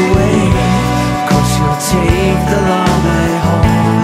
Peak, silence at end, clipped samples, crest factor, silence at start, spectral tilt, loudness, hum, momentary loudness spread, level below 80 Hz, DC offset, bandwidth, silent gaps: 0 dBFS; 0 s; under 0.1%; 12 dB; 0 s; -6 dB/octave; -12 LUFS; none; 2 LU; -22 dBFS; under 0.1%; 16 kHz; none